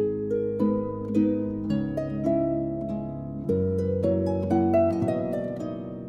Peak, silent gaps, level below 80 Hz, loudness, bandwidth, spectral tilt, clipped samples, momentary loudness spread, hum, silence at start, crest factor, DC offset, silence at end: -12 dBFS; none; -50 dBFS; -26 LUFS; 9 kHz; -10 dB/octave; under 0.1%; 9 LU; none; 0 s; 14 dB; under 0.1%; 0 s